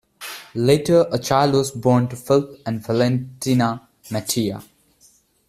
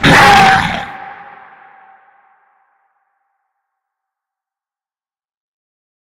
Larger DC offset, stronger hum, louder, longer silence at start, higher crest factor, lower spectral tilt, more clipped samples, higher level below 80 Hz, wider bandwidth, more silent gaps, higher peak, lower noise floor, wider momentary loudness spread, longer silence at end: neither; neither; second, -20 LUFS vs -8 LUFS; first, 0.2 s vs 0 s; about the same, 18 dB vs 16 dB; first, -5.5 dB/octave vs -4 dB/octave; neither; second, -54 dBFS vs -38 dBFS; about the same, 15 kHz vs 16.5 kHz; neither; about the same, -2 dBFS vs 0 dBFS; second, -56 dBFS vs under -90 dBFS; second, 13 LU vs 27 LU; second, 0.85 s vs 4.9 s